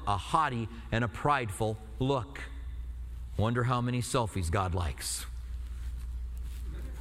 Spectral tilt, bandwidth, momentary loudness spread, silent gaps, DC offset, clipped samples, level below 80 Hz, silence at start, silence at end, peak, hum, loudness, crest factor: -5.5 dB/octave; 15.5 kHz; 13 LU; none; under 0.1%; under 0.1%; -40 dBFS; 0 s; 0 s; -12 dBFS; none; -33 LUFS; 20 dB